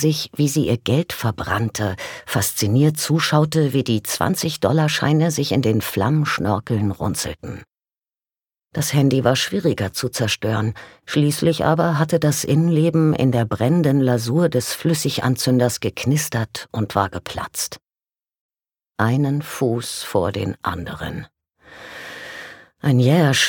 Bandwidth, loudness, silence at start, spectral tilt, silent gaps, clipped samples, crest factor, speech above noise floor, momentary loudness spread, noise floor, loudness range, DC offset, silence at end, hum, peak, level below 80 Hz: 19 kHz; -20 LUFS; 0 s; -5 dB/octave; 18.41-18.49 s; under 0.1%; 18 dB; over 71 dB; 12 LU; under -90 dBFS; 6 LU; under 0.1%; 0 s; none; -2 dBFS; -50 dBFS